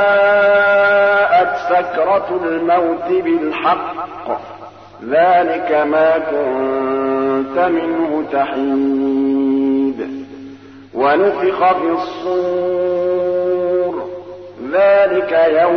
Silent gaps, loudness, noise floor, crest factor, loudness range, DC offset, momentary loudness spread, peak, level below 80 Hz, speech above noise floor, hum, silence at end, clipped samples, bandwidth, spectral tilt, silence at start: none; -15 LUFS; -36 dBFS; 12 dB; 3 LU; 0.2%; 14 LU; -2 dBFS; -58 dBFS; 21 dB; none; 0 s; under 0.1%; 6.2 kHz; -7 dB/octave; 0 s